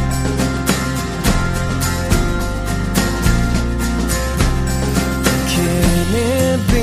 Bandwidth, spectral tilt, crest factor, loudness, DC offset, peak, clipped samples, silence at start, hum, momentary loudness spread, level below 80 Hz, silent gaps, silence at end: 15.5 kHz; -5 dB/octave; 16 dB; -17 LUFS; under 0.1%; 0 dBFS; under 0.1%; 0 s; none; 4 LU; -22 dBFS; none; 0 s